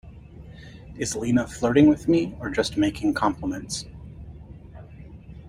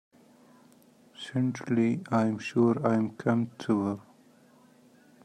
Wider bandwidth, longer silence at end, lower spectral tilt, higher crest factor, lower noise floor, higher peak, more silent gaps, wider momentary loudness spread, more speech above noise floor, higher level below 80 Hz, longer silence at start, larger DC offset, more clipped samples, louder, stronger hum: first, 14.5 kHz vs 10 kHz; second, 0 s vs 1.25 s; second, -5.5 dB/octave vs -7.5 dB/octave; about the same, 20 dB vs 18 dB; second, -43 dBFS vs -59 dBFS; first, -6 dBFS vs -12 dBFS; neither; first, 26 LU vs 8 LU; second, 21 dB vs 32 dB; first, -46 dBFS vs -74 dBFS; second, 0.05 s vs 1.2 s; neither; neither; first, -23 LUFS vs -28 LUFS; neither